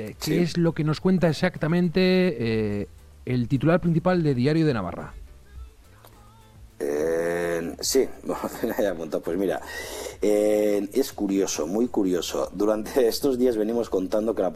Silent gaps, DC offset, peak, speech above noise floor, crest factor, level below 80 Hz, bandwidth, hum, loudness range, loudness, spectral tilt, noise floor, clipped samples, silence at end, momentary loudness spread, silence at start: none; under 0.1%; -8 dBFS; 27 dB; 16 dB; -48 dBFS; 15 kHz; none; 5 LU; -24 LUFS; -6 dB/octave; -50 dBFS; under 0.1%; 0 s; 9 LU; 0 s